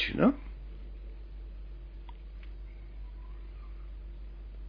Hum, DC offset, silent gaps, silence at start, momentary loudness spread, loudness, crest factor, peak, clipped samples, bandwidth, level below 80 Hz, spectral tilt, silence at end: none; under 0.1%; none; 0 s; 19 LU; -39 LUFS; 26 dB; -10 dBFS; under 0.1%; 5.2 kHz; -44 dBFS; -5 dB/octave; 0 s